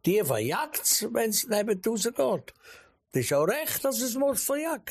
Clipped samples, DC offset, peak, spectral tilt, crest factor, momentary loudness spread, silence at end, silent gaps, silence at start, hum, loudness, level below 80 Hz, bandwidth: under 0.1%; under 0.1%; -12 dBFS; -3.5 dB/octave; 16 dB; 5 LU; 0 s; none; 0.05 s; none; -27 LUFS; -66 dBFS; 15.5 kHz